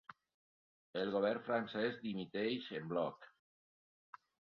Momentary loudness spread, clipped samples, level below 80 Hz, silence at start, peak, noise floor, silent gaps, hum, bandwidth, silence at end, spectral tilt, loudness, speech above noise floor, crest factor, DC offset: 9 LU; under 0.1%; -82 dBFS; 0.1 s; -22 dBFS; under -90 dBFS; 0.34-0.93 s, 3.39-4.13 s; none; 6.2 kHz; 0.35 s; -4 dB/octave; -40 LUFS; over 51 dB; 20 dB; under 0.1%